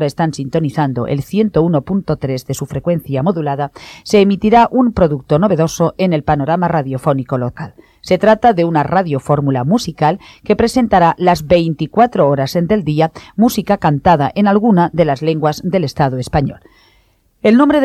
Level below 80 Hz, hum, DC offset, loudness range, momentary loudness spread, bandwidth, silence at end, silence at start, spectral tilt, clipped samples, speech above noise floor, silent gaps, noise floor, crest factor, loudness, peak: -40 dBFS; none; under 0.1%; 3 LU; 8 LU; 14.5 kHz; 0 s; 0 s; -7 dB/octave; under 0.1%; 41 dB; none; -55 dBFS; 14 dB; -14 LUFS; 0 dBFS